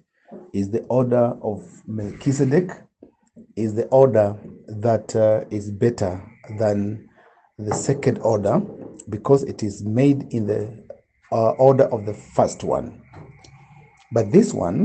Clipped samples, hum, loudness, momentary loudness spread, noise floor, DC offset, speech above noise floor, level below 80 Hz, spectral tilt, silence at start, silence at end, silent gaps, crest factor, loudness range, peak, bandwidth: under 0.1%; none; -21 LUFS; 17 LU; -55 dBFS; under 0.1%; 35 dB; -56 dBFS; -7.5 dB/octave; 0.3 s; 0 s; none; 20 dB; 3 LU; -2 dBFS; 9 kHz